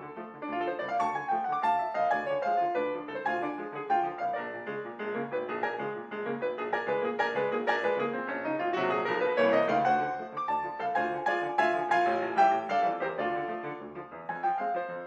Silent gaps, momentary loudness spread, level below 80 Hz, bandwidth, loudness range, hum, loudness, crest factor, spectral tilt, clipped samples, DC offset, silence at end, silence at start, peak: none; 11 LU; -72 dBFS; 8.8 kHz; 5 LU; none; -30 LUFS; 18 dB; -5.5 dB/octave; under 0.1%; under 0.1%; 0 s; 0 s; -12 dBFS